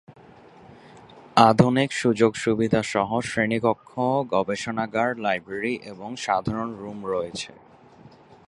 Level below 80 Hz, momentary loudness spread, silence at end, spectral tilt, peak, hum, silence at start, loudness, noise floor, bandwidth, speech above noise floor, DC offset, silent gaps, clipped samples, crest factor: -56 dBFS; 14 LU; 0.4 s; -5.5 dB/octave; -2 dBFS; none; 0.1 s; -23 LUFS; -50 dBFS; 11.5 kHz; 27 dB; under 0.1%; none; under 0.1%; 24 dB